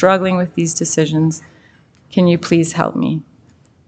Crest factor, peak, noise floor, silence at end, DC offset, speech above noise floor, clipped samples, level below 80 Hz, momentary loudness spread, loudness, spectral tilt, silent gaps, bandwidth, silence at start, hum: 16 dB; 0 dBFS; -49 dBFS; 0.65 s; under 0.1%; 34 dB; under 0.1%; -54 dBFS; 7 LU; -16 LUFS; -5.5 dB/octave; none; 9.2 kHz; 0 s; none